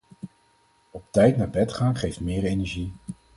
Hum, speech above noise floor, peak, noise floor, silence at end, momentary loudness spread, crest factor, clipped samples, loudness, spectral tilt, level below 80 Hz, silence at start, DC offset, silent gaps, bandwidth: none; 40 dB; -6 dBFS; -62 dBFS; 0.25 s; 24 LU; 20 dB; under 0.1%; -24 LUFS; -7 dB/octave; -44 dBFS; 0.25 s; under 0.1%; none; 11.5 kHz